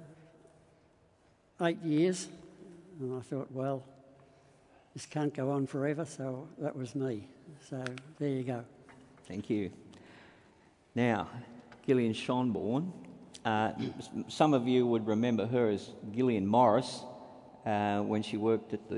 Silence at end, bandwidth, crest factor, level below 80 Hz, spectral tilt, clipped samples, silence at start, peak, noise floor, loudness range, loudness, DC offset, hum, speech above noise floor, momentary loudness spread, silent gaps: 0 s; 11 kHz; 22 dB; -74 dBFS; -6.5 dB/octave; under 0.1%; 0 s; -12 dBFS; -67 dBFS; 9 LU; -33 LUFS; under 0.1%; none; 35 dB; 20 LU; none